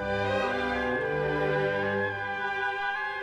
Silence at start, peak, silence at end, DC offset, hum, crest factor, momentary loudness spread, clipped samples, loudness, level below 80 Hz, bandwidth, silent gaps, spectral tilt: 0 s; -16 dBFS; 0 s; under 0.1%; 50 Hz at -45 dBFS; 12 dB; 3 LU; under 0.1%; -28 LUFS; -52 dBFS; 10.5 kHz; none; -6 dB/octave